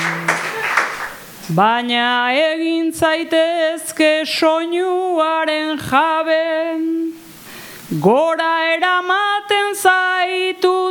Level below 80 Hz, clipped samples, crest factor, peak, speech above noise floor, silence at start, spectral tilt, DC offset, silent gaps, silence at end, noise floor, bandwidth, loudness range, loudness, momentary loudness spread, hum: -58 dBFS; under 0.1%; 16 dB; 0 dBFS; 20 dB; 0 s; -4 dB/octave; under 0.1%; none; 0 s; -36 dBFS; 19 kHz; 2 LU; -16 LUFS; 8 LU; none